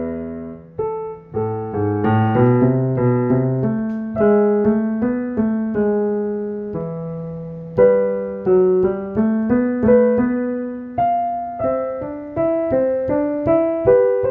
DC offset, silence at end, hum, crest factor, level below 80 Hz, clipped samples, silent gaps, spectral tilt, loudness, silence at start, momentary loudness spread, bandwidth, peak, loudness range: under 0.1%; 0 s; none; 16 dB; -48 dBFS; under 0.1%; none; -12 dB/octave; -18 LUFS; 0 s; 12 LU; 3.2 kHz; -2 dBFS; 3 LU